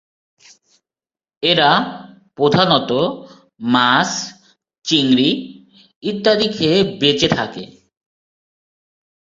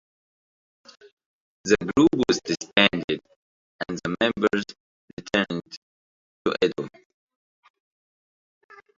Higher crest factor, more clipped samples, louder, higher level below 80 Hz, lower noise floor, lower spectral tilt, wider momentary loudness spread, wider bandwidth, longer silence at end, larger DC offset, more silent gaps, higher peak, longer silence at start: second, 18 dB vs 26 dB; neither; first, -16 LUFS vs -24 LUFS; about the same, -54 dBFS vs -58 dBFS; about the same, under -90 dBFS vs under -90 dBFS; about the same, -4.5 dB/octave vs -4.5 dB/octave; second, 15 LU vs 19 LU; about the same, 7.8 kHz vs 7.8 kHz; second, 1.75 s vs 2.1 s; neither; second, 5.96-6.01 s vs 3.04-3.08 s, 3.36-3.79 s, 4.80-5.17 s, 5.77-6.45 s; about the same, 0 dBFS vs -2 dBFS; second, 1.4 s vs 1.65 s